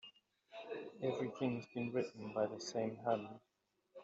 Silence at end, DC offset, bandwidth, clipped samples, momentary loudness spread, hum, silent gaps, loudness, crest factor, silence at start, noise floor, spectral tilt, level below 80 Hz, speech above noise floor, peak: 0 s; under 0.1%; 7.8 kHz; under 0.1%; 14 LU; none; none; -42 LUFS; 20 dB; 0.05 s; -64 dBFS; -5.5 dB/octave; -84 dBFS; 23 dB; -22 dBFS